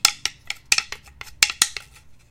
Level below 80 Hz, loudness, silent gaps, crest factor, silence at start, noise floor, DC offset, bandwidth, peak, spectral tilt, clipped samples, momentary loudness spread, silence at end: -52 dBFS; -20 LUFS; none; 24 dB; 0.05 s; -48 dBFS; under 0.1%; 17 kHz; 0 dBFS; 2.5 dB/octave; under 0.1%; 19 LU; 0.15 s